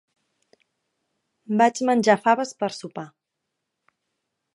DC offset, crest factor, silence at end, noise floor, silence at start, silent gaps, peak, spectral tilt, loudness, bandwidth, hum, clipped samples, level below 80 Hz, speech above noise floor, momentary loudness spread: under 0.1%; 22 dB; 1.5 s; -81 dBFS; 1.5 s; none; -4 dBFS; -4.5 dB/octave; -21 LUFS; 11.5 kHz; none; under 0.1%; -78 dBFS; 60 dB; 18 LU